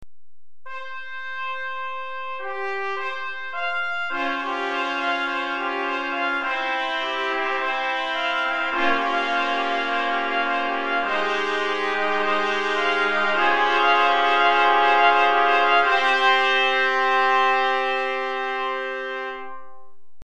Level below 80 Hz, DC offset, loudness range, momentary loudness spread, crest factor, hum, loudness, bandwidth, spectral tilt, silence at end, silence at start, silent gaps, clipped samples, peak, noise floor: -62 dBFS; under 0.1%; 9 LU; 13 LU; 16 dB; none; -21 LUFS; 10 kHz; -2 dB/octave; 0 s; 0 s; none; under 0.1%; -6 dBFS; under -90 dBFS